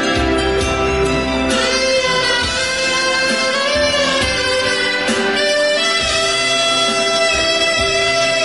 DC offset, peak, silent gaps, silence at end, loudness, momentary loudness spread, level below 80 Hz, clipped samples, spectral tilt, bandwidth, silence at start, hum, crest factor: 0.4%; -4 dBFS; none; 0 s; -14 LUFS; 3 LU; -32 dBFS; under 0.1%; -2.5 dB/octave; 11.5 kHz; 0 s; none; 12 dB